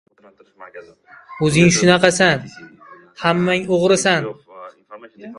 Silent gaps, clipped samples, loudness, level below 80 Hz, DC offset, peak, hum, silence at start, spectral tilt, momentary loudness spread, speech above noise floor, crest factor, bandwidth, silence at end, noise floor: none; under 0.1%; -15 LUFS; -52 dBFS; under 0.1%; 0 dBFS; none; 0.6 s; -4.5 dB/octave; 19 LU; 25 dB; 18 dB; 11.5 kHz; 0.05 s; -42 dBFS